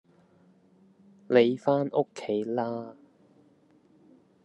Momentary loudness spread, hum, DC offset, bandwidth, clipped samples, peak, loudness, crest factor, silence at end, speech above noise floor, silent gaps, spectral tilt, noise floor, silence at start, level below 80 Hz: 12 LU; none; under 0.1%; 8.8 kHz; under 0.1%; -6 dBFS; -27 LUFS; 24 dB; 1.55 s; 36 dB; none; -7 dB/octave; -62 dBFS; 1.3 s; -84 dBFS